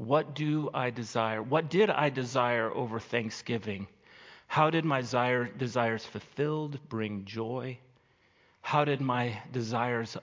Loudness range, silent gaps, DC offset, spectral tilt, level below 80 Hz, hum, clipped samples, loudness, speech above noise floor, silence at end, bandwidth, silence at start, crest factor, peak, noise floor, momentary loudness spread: 4 LU; none; under 0.1%; -6 dB/octave; -68 dBFS; none; under 0.1%; -31 LUFS; 36 dB; 0 s; 7.6 kHz; 0 s; 20 dB; -10 dBFS; -66 dBFS; 11 LU